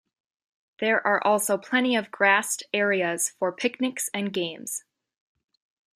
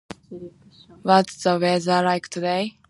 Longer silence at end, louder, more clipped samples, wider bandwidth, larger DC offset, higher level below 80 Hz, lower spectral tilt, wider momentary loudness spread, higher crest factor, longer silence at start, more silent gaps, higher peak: first, 1.2 s vs 0.2 s; second, -24 LUFS vs -21 LUFS; neither; first, 15.5 kHz vs 11.5 kHz; neither; second, -78 dBFS vs -64 dBFS; second, -2.5 dB/octave vs -5 dB/octave; second, 9 LU vs 21 LU; about the same, 20 dB vs 22 dB; first, 0.8 s vs 0.1 s; neither; second, -6 dBFS vs -2 dBFS